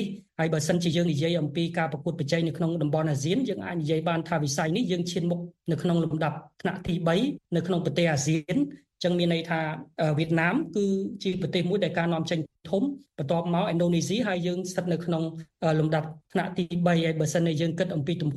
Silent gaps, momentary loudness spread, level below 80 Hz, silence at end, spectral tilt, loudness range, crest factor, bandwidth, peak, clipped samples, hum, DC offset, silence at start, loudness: none; 6 LU; -60 dBFS; 0 s; -6 dB/octave; 1 LU; 16 dB; 12.5 kHz; -10 dBFS; under 0.1%; none; under 0.1%; 0 s; -27 LUFS